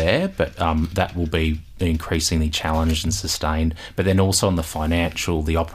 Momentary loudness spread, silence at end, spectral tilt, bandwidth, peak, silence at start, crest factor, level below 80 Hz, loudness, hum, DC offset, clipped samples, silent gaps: 5 LU; 0 s; -4.5 dB/octave; 15.5 kHz; -4 dBFS; 0 s; 18 dB; -30 dBFS; -21 LUFS; none; under 0.1%; under 0.1%; none